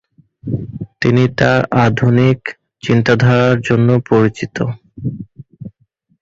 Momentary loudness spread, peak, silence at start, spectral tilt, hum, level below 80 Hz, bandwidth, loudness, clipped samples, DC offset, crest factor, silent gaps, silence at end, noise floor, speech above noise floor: 20 LU; -2 dBFS; 0.45 s; -7.5 dB/octave; none; -44 dBFS; 7.6 kHz; -14 LUFS; under 0.1%; under 0.1%; 14 dB; none; 0.55 s; -59 dBFS; 47 dB